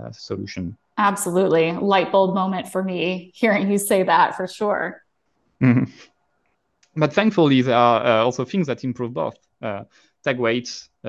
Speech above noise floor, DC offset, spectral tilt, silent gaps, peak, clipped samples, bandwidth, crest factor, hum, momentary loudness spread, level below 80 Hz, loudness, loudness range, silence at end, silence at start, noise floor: 50 dB; under 0.1%; -5.5 dB/octave; none; -2 dBFS; under 0.1%; 12.5 kHz; 18 dB; none; 14 LU; -58 dBFS; -20 LUFS; 3 LU; 0 s; 0 s; -70 dBFS